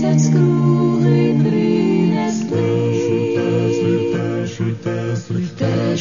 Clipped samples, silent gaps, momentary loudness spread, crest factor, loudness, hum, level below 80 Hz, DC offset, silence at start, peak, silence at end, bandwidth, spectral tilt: under 0.1%; none; 8 LU; 12 dB; -17 LUFS; none; -56 dBFS; 0.4%; 0 s; -4 dBFS; 0 s; 7.4 kHz; -7.5 dB/octave